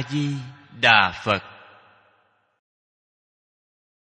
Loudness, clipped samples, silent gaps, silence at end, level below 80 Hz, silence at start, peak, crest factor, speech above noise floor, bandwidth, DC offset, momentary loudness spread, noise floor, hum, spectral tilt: -20 LUFS; under 0.1%; none; 2.65 s; -62 dBFS; 0 s; -2 dBFS; 24 dB; 44 dB; 9.2 kHz; under 0.1%; 17 LU; -65 dBFS; none; -4.5 dB/octave